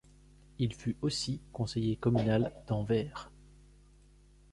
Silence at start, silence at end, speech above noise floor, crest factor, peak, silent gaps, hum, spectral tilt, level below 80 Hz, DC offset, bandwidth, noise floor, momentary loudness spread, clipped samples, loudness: 0.6 s; 1.25 s; 28 dB; 18 dB; -16 dBFS; none; 50 Hz at -50 dBFS; -6.5 dB/octave; -54 dBFS; under 0.1%; 11.5 kHz; -60 dBFS; 9 LU; under 0.1%; -33 LUFS